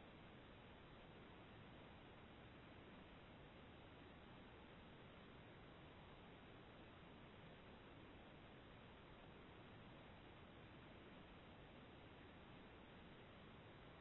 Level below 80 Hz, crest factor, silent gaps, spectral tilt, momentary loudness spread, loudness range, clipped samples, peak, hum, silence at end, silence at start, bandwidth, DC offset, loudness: -72 dBFS; 12 dB; none; -4 dB/octave; 1 LU; 0 LU; under 0.1%; -50 dBFS; none; 0 s; 0 s; 4 kHz; under 0.1%; -63 LUFS